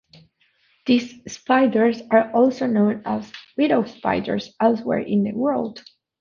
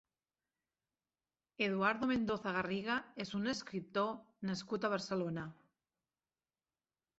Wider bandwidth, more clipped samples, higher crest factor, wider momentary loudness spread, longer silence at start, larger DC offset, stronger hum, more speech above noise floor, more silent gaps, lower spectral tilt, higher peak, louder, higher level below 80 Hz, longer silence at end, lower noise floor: second, 7.2 kHz vs 8 kHz; neither; about the same, 20 dB vs 22 dB; first, 11 LU vs 8 LU; second, 0.85 s vs 1.6 s; neither; neither; second, 43 dB vs over 52 dB; neither; first, -6.5 dB/octave vs -4 dB/octave; first, -2 dBFS vs -18 dBFS; first, -21 LUFS vs -38 LUFS; first, -60 dBFS vs -74 dBFS; second, 0.4 s vs 1.65 s; second, -63 dBFS vs under -90 dBFS